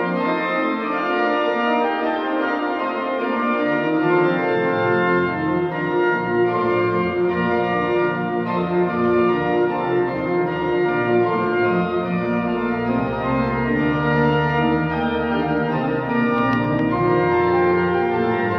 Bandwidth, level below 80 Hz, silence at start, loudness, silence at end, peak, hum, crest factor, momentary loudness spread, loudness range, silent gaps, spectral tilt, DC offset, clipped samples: 6 kHz; -46 dBFS; 0 s; -20 LUFS; 0 s; -6 dBFS; none; 14 dB; 4 LU; 1 LU; none; -8.5 dB/octave; under 0.1%; under 0.1%